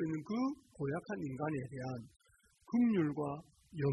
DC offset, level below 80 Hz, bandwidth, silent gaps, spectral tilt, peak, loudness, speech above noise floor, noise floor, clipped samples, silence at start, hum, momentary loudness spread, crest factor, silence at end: under 0.1%; -70 dBFS; 10.5 kHz; none; -8.5 dB/octave; -22 dBFS; -38 LUFS; 28 dB; -64 dBFS; under 0.1%; 0 s; none; 12 LU; 14 dB; 0 s